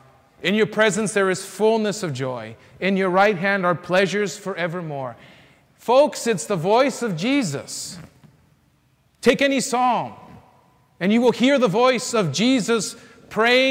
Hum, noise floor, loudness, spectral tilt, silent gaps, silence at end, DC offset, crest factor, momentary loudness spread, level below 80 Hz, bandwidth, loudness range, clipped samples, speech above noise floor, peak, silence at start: none; -61 dBFS; -20 LUFS; -4.5 dB/octave; none; 0 s; under 0.1%; 16 dB; 13 LU; -62 dBFS; 16 kHz; 3 LU; under 0.1%; 41 dB; -6 dBFS; 0.4 s